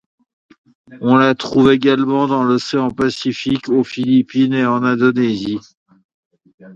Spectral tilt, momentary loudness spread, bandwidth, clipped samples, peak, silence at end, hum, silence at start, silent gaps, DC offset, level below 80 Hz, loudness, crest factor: -6.5 dB/octave; 8 LU; 7.8 kHz; under 0.1%; 0 dBFS; 0 s; none; 0.9 s; 5.77-5.86 s, 6.04-6.31 s, 6.54-6.58 s; under 0.1%; -52 dBFS; -15 LUFS; 16 dB